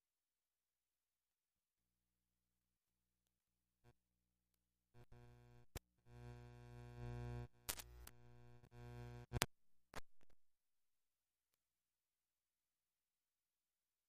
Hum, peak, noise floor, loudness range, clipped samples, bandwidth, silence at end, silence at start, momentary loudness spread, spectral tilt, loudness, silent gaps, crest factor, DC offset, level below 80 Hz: none; -10 dBFS; under -90 dBFS; 16 LU; under 0.1%; 15 kHz; 3.55 s; 3.85 s; 22 LU; -3.5 dB/octave; -53 LUFS; none; 48 dB; under 0.1%; -66 dBFS